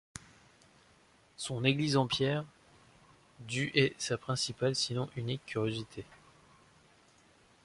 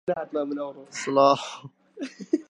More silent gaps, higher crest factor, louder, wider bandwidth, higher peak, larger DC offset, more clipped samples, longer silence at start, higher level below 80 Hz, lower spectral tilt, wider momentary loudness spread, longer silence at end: neither; about the same, 24 dB vs 20 dB; second, -33 LUFS vs -25 LUFS; about the same, 11.5 kHz vs 10.5 kHz; second, -12 dBFS vs -6 dBFS; neither; neither; about the same, 0.15 s vs 0.05 s; first, -66 dBFS vs -76 dBFS; about the same, -4.5 dB/octave vs -4.5 dB/octave; about the same, 20 LU vs 19 LU; first, 1.5 s vs 0.1 s